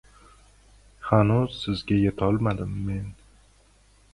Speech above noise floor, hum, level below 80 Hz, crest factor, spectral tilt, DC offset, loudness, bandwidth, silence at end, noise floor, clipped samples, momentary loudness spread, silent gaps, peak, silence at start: 34 dB; none; -44 dBFS; 22 dB; -8 dB/octave; under 0.1%; -25 LUFS; 11 kHz; 1 s; -58 dBFS; under 0.1%; 13 LU; none; -4 dBFS; 1 s